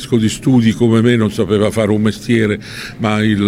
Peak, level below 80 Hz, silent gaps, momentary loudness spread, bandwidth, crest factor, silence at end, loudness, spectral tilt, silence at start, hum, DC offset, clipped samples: 0 dBFS; -42 dBFS; none; 6 LU; 15 kHz; 12 dB; 0 s; -14 LUFS; -6.5 dB/octave; 0 s; none; under 0.1%; under 0.1%